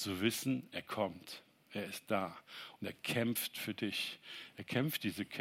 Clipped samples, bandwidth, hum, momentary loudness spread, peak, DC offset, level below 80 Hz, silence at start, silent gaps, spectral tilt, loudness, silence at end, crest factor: under 0.1%; 16 kHz; none; 14 LU; -20 dBFS; under 0.1%; -80 dBFS; 0 s; none; -4 dB/octave; -39 LUFS; 0 s; 20 dB